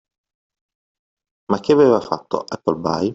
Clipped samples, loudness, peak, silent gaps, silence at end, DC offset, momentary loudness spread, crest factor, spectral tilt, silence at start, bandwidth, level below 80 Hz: under 0.1%; -18 LUFS; -2 dBFS; none; 0 s; under 0.1%; 10 LU; 18 dB; -7 dB/octave; 1.5 s; 7.8 kHz; -58 dBFS